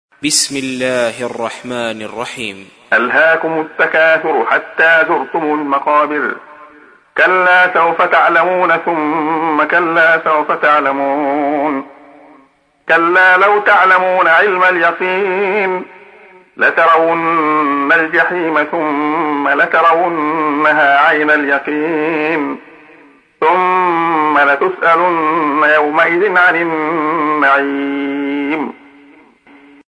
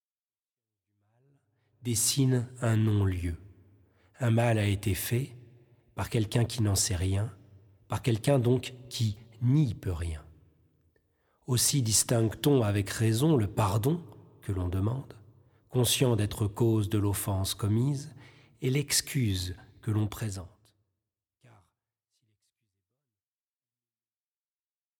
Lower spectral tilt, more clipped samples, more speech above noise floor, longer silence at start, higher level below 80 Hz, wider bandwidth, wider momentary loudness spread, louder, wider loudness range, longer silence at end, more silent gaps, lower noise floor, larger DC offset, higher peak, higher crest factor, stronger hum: second, -3.5 dB/octave vs -5 dB/octave; neither; second, 38 dB vs over 62 dB; second, 0.2 s vs 1.85 s; second, -64 dBFS vs -52 dBFS; second, 11 kHz vs 19 kHz; second, 9 LU vs 13 LU; first, -12 LUFS vs -29 LUFS; about the same, 3 LU vs 5 LU; second, 1.15 s vs 4.5 s; neither; second, -50 dBFS vs under -90 dBFS; neither; first, 0 dBFS vs -12 dBFS; about the same, 14 dB vs 18 dB; neither